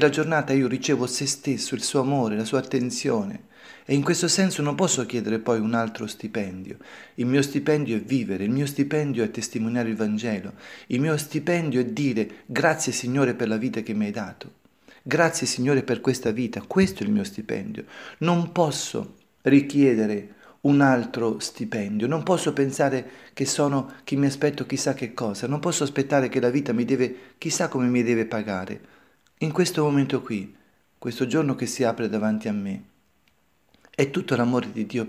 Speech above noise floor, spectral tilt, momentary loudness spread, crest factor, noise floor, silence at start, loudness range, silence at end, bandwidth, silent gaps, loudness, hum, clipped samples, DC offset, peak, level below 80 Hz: 42 dB; -5 dB/octave; 11 LU; 20 dB; -66 dBFS; 0 s; 3 LU; 0 s; 16 kHz; none; -24 LUFS; none; under 0.1%; under 0.1%; -4 dBFS; -64 dBFS